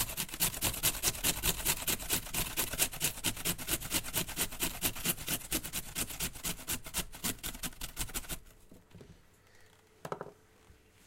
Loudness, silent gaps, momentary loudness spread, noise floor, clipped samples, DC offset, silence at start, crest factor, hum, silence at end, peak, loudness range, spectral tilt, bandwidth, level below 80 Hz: -33 LUFS; none; 10 LU; -61 dBFS; under 0.1%; under 0.1%; 0 s; 24 dB; none; 0.3 s; -12 dBFS; 10 LU; -1.5 dB/octave; 17 kHz; -48 dBFS